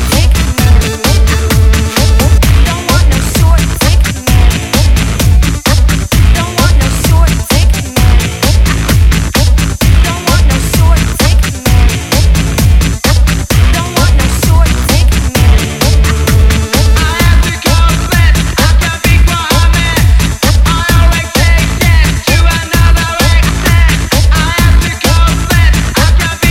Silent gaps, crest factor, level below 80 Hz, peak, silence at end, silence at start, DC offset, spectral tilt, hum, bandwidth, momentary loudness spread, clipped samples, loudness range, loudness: none; 8 dB; -10 dBFS; 0 dBFS; 0 s; 0 s; under 0.1%; -4.5 dB/octave; none; 16.5 kHz; 2 LU; 0.8%; 1 LU; -9 LUFS